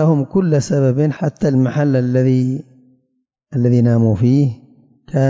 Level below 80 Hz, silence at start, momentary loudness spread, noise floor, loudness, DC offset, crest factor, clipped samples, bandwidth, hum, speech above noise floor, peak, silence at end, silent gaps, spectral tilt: -48 dBFS; 0 s; 8 LU; -69 dBFS; -16 LUFS; under 0.1%; 12 dB; under 0.1%; 7.8 kHz; none; 54 dB; -4 dBFS; 0 s; none; -8.5 dB/octave